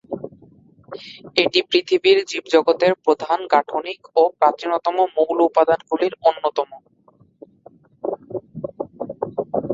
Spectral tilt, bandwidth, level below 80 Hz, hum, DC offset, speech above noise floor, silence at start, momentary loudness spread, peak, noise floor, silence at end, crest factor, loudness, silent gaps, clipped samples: -4.5 dB/octave; 7.8 kHz; -64 dBFS; none; under 0.1%; 37 dB; 0.1 s; 16 LU; -2 dBFS; -55 dBFS; 0 s; 18 dB; -19 LUFS; none; under 0.1%